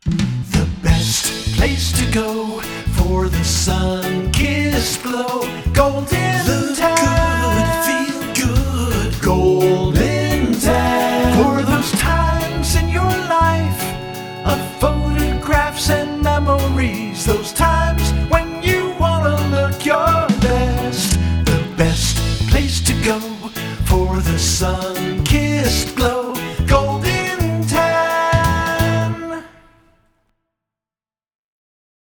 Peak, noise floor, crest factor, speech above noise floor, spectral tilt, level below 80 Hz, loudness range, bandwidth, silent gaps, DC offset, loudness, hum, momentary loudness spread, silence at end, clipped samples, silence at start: 0 dBFS; under -90 dBFS; 16 dB; over 72 dB; -5 dB/octave; -24 dBFS; 2 LU; over 20 kHz; none; under 0.1%; -17 LUFS; none; 6 LU; 2.6 s; under 0.1%; 0.05 s